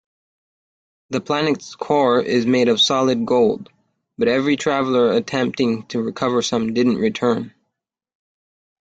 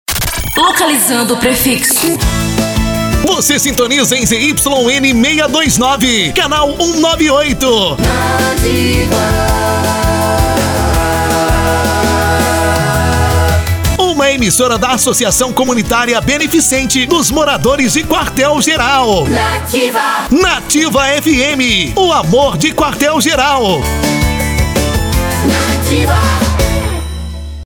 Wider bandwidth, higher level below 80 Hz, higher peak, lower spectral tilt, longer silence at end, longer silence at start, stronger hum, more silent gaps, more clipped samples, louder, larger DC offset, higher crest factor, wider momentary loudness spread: second, 9 kHz vs over 20 kHz; second, -60 dBFS vs -22 dBFS; second, -4 dBFS vs 0 dBFS; about the same, -4.5 dB/octave vs -3.5 dB/octave; first, 1.4 s vs 0 s; first, 1.1 s vs 0.1 s; neither; neither; neither; second, -19 LUFS vs -11 LUFS; neither; about the same, 16 dB vs 12 dB; first, 9 LU vs 4 LU